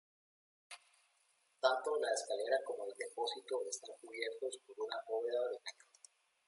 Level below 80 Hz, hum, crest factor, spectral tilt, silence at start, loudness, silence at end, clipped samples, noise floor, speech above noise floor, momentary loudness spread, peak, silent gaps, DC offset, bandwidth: under -90 dBFS; none; 24 dB; 0.5 dB/octave; 0.7 s; -40 LUFS; 0.75 s; under 0.1%; -76 dBFS; 37 dB; 16 LU; -18 dBFS; none; under 0.1%; 11.5 kHz